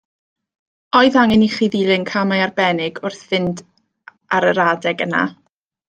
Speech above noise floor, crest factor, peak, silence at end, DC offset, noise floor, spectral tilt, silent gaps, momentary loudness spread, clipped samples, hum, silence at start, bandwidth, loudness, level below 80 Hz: 31 dB; 16 dB; -2 dBFS; 0.55 s; under 0.1%; -47 dBFS; -5.5 dB/octave; none; 11 LU; under 0.1%; none; 0.95 s; 9.2 kHz; -17 LUFS; -56 dBFS